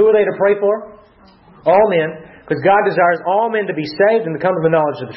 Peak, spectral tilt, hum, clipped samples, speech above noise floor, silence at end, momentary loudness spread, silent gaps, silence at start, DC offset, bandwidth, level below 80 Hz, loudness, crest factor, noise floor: -2 dBFS; -9 dB/octave; none; under 0.1%; 32 dB; 0 s; 9 LU; none; 0 s; under 0.1%; 5.8 kHz; -56 dBFS; -15 LUFS; 12 dB; -47 dBFS